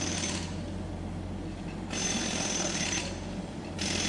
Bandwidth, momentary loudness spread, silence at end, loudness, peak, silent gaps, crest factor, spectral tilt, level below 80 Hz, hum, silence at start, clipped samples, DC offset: 11.5 kHz; 9 LU; 0 s; -33 LUFS; -16 dBFS; none; 16 dB; -3 dB/octave; -48 dBFS; none; 0 s; under 0.1%; under 0.1%